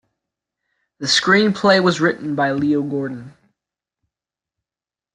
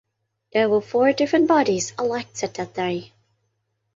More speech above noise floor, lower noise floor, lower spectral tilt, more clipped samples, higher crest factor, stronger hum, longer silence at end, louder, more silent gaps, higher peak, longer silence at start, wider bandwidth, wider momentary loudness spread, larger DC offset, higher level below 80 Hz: first, over 73 dB vs 53 dB; first, under -90 dBFS vs -73 dBFS; about the same, -4.5 dB/octave vs -4.5 dB/octave; neither; about the same, 18 dB vs 16 dB; neither; first, 1.85 s vs 0.9 s; first, -17 LUFS vs -21 LUFS; neither; first, -2 dBFS vs -6 dBFS; first, 1 s vs 0.55 s; first, 11.5 kHz vs 8 kHz; about the same, 12 LU vs 11 LU; neither; about the same, -62 dBFS vs -64 dBFS